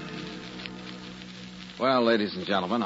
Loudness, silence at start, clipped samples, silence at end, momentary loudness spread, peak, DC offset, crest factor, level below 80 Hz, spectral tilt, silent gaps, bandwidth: -28 LUFS; 0 s; under 0.1%; 0 s; 18 LU; -10 dBFS; under 0.1%; 18 dB; -62 dBFS; -5.5 dB/octave; none; 8 kHz